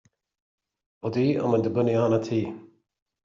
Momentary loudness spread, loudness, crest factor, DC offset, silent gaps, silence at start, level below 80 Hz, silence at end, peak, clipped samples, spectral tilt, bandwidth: 13 LU; -25 LUFS; 16 dB; under 0.1%; none; 1.05 s; -66 dBFS; 0.6 s; -10 dBFS; under 0.1%; -7.5 dB/octave; 7.6 kHz